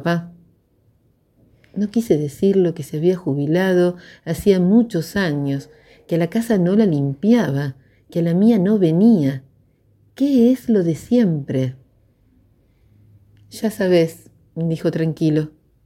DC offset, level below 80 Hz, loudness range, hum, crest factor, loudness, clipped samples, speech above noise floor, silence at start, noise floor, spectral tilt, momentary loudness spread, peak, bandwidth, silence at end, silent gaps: under 0.1%; -54 dBFS; 6 LU; none; 18 dB; -18 LUFS; under 0.1%; 42 dB; 0 s; -59 dBFS; -7.5 dB/octave; 11 LU; -2 dBFS; 15.5 kHz; 0.35 s; none